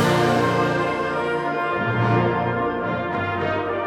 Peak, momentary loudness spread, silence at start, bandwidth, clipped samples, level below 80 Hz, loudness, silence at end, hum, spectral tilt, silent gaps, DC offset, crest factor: -8 dBFS; 5 LU; 0 s; 16 kHz; under 0.1%; -50 dBFS; -22 LUFS; 0 s; 60 Hz at -45 dBFS; -6.5 dB/octave; none; under 0.1%; 14 dB